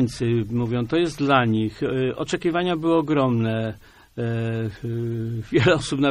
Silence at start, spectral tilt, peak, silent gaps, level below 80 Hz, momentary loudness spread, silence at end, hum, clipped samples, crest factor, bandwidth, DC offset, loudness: 0 s; -6.5 dB/octave; -2 dBFS; none; -50 dBFS; 9 LU; 0 s; none; under 0.1%; 20 dB; 11.5 kHz; under 0.1%; -23 LUFS